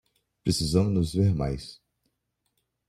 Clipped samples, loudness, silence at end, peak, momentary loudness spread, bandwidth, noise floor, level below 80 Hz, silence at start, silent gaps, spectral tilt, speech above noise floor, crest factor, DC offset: under 0.1%; -26 LUFS; 1.15 s; -8 dBFS; 11 LU; 15 kHz; -78 dBFS; -46 dBFS; 0.45 s; none; -6.5 dB/octave; 53 dB; 20 dB; under 0.1%